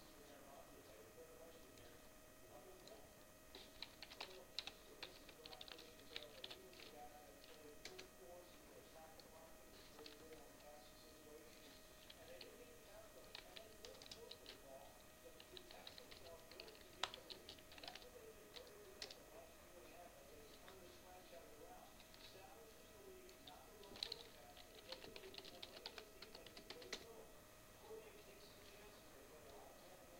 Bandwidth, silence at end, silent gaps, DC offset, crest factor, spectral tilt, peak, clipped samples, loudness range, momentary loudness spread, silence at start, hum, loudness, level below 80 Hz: 16.5 kHz; 0 s; none; under 0.1%; 36 dB; -2 dB/octave; -24 dBFS; under 0.1%; 6 LU; 9 LU; 0 s; none; -58 LUFS; -74 dBFS